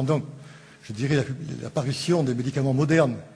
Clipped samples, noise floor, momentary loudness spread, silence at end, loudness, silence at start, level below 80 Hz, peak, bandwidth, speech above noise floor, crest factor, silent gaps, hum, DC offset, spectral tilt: under 0.1%; -46 dBFS; 14 LU; 0 s; -25 LUFS; 0 s; -60 dBFS; -6 dBFS; 11 kHz; 22 dB; 18 dB; none; none; under 0.1%; -6.5 dB/octave